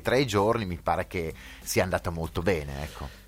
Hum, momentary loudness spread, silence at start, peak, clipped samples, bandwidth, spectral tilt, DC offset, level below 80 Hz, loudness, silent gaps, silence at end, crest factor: none; 12 LU; 0 s; -10 dBFS; under 0.1%; 16.5 kHz; -5 dB/octave; under 0.1%; -46 dBFS; -28 LUFS; none; 0 s; 18 dB